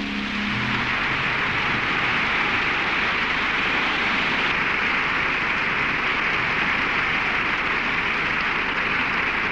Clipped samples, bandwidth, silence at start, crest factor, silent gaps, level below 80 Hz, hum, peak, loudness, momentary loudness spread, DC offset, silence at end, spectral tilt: under 0.1%; 12.5 kHz; 0 s; 10 dB; none; -44 dBFS; none; -12 dBFS; -21 LUFS; 1 LU; under 0.1%; 0 s; -4 dB/octave